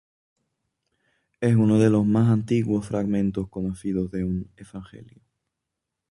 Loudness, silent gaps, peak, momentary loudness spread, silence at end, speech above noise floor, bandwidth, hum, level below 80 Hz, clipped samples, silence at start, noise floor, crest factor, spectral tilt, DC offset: -23 LUFS; none; -6 dBFS; 16 LU; 1.05 s; 61 dB; 11.5 kHz; none; -50 dBFS; under 0.1%; 1.4 s; -83 dBFS; 18 dB; -8.5 dB/octave; under 0.1%